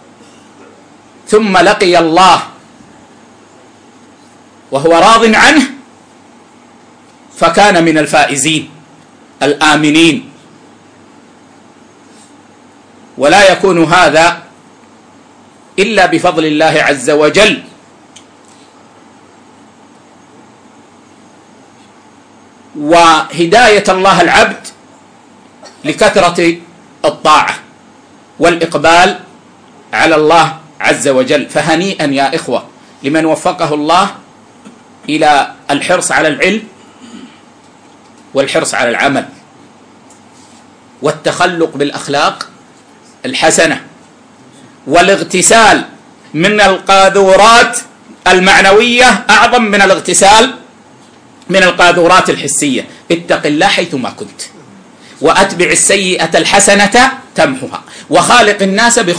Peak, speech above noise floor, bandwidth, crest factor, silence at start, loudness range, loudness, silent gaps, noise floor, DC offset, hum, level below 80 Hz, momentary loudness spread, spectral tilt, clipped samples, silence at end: 0 dBFS; 32 dB; 11 kHz; 10 dB; 1.3 s; 8 LU; -8 LUFS; none; -40 dBFS; under 0.1%; none; -42 dBFS; 13 LU; -3 dB/octave; 0.2%; 0 s